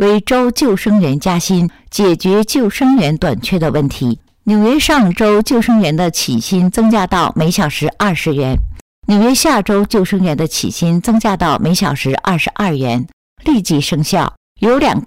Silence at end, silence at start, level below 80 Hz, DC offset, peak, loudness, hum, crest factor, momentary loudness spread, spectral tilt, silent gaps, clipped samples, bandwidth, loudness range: 0 s; 0 s; -32 dBFS; 0.4%; -4 dBFS; -13 LUFS; none; 8 dB; 6 LU; -5.5 dB/octave; 8.81-9.02 s, 13.13-13.36 s, 14.37-14.55 s; under 0.1%; 16 kHz; 2 LU